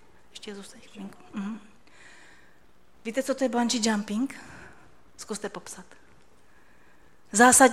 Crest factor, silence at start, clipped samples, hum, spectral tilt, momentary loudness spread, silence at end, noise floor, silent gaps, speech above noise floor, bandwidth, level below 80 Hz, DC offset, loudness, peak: 26 dB; 0.35 s; under 0.1%; none; -2.5 dB/octave; 23 LU; 0 s; -61 dBFS; none; 35 dB; 15.5 kHz; -64 dBFS; 0.3%; -25 LUFS; -2 dBFS